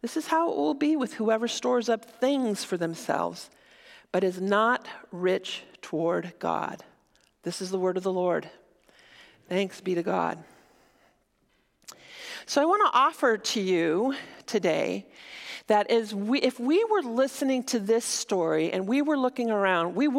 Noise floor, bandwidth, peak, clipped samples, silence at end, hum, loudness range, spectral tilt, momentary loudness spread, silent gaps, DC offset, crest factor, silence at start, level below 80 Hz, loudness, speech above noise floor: -69 dBFS; 16.5 kHz; -10 dBFS; under 0.1%; 0 s; none; 6 LU; -4.5 dB/octave; 13 LU; none; under 0.1%; 18 dB; 0.05 s; -76 dBFS; -27 LUFS; 43 dB